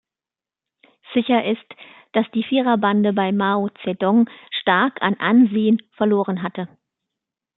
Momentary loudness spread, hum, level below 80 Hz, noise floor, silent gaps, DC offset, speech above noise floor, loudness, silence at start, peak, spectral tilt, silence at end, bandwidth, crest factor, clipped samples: 9 LU; none; -68 dBFS; under -90 dBFS; none; under 0.1%; over 71 dB; -19 LUFS; 1.1 s; -2 dBFS; -10.5 dB/octave; 0.9 s; 4.1 kHz; 18 dB; under 0.1%